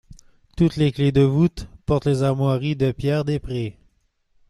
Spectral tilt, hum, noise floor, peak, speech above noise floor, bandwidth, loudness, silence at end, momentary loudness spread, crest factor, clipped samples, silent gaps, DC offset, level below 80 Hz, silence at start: -8 dB/octave; none; -64 dBFS; -6 dBFS; 44 dB; 11.5 kHz; -21 LUFS; 0.8 s; 10 LU; 16 dB; under 0.1%; none; under 0.1%; -42 dBFS; 0.1 s